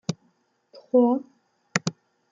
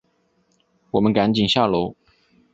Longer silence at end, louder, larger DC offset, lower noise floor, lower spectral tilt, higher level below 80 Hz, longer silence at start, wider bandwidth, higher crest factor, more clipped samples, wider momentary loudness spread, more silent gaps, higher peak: second, 0.4 s vs 0.6 s; second, -25 LUFS vs -20 LUFS; neither; about the same, -68 dBFS vs -65 dBFS; second, -5 dB/octave vs -6.5 dB/octave; second, -68 dBFS vs -52 dBFS; second, 0.1 s vs 0.95 s; first, 9 kHz vs 8 kHz; about the same, 24 dB vs 20 dB; neither; first, 14 LU vs 7 LU; neither; about the same, -4 dBFS vs -4 dBFS